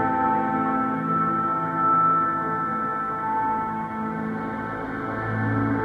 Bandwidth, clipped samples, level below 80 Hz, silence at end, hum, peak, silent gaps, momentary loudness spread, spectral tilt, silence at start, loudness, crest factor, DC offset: 8 kHz; under 0.1%; -54 dBFS; 0 s; none; -12 dBFS; none; 9 LU; -9 dB/octave; 0 s; -24 LUFS; 14 dB; under 0.1%